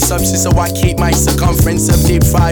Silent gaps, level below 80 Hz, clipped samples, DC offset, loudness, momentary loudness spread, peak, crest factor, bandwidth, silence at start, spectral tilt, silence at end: none; -18 dBFS; under 0.1%; under 0.1%; -12 LUFS; 2 LU; 0 dBFS; 10 dB; over 20 kHz; 0 s; -5 dB/octave; 0 s